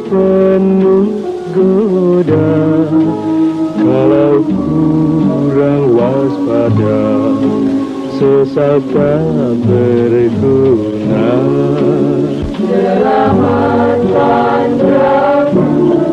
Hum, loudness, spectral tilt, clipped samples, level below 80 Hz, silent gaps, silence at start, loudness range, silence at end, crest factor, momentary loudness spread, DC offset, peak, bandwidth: none; -11 LUFS; -9 dB/octave; under 0.1%; -40 dBFS; none; 0 s; 1 LU; 0 s; 10 dB; 4 LU; under 0.1%; 0 dBFS; 8.8 kHz